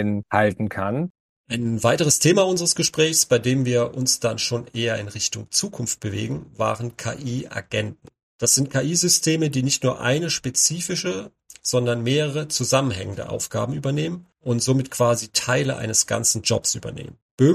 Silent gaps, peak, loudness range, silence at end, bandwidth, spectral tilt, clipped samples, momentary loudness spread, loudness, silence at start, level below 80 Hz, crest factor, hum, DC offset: 1.10-1.44 s, 8.23-8.39 s, 17.22-17.38 s; -4 dBFS; 5 LU; 0 s; 15.5 kHz; -3.5 dB/octave; under 0.1%; 11 LU; -21 LUFS; 0 s; -56 dBFS; 18 dB; none; under 0.1%